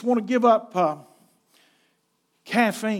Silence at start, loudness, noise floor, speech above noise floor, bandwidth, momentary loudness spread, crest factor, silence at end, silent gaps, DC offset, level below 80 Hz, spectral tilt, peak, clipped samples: 0 s; -22 LUFS; -70 dBFS; 49 dB; 16 kHz; 7 LU; 20 dB; 0 s; none; under 0.1%; -90 dBFS; -5.5 dB/octave; -6 dBFS; under 0.1%